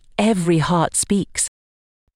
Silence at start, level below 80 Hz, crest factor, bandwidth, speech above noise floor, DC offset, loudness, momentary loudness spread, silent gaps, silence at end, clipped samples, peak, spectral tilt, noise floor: 0.2 s; -46 dBFS; 14 dB; 15 kHz; over 72 dB; under 0.1%; -19 LUFS; 5 LU; none; 0.7 s; under 0.1%; -6 dBFS; -4.5 dB/octave; under -90 dBFS